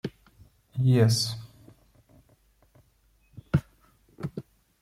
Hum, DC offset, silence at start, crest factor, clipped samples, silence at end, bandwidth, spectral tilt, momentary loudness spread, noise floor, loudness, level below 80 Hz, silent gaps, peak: none; under 0.1%; 0.05 s; 20 dB; under 0.1%; 0.4 s; 15 kHz; -6 dB/octave; 19 LU; -65 dBFS; -27 LUFS; -56 dBFS; none; -10 dBFS